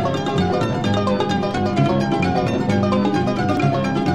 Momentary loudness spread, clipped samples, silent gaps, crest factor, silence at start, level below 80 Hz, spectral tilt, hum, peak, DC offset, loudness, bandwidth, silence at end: 2 LU; under 0.1%; none; 14 dB; 0 s; -44 dBFS; -7 dB/octave; none; -4 dBFS; 0.8%; -19 LUFS; 11.5 kHz; 0 s